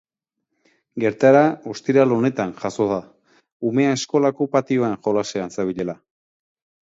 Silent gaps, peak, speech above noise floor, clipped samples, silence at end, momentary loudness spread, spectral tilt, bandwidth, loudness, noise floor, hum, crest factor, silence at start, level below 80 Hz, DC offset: 3.52-3.60 s; -2 dBFS; 60 dB; under 0.1%; 0.9 s; 12 LU; -6 dB/octave; 7.8 kHz; -20 LUFS; -79 dBFS; none; 20 dB; 0.95 s; -62 dBFS; under 0.1%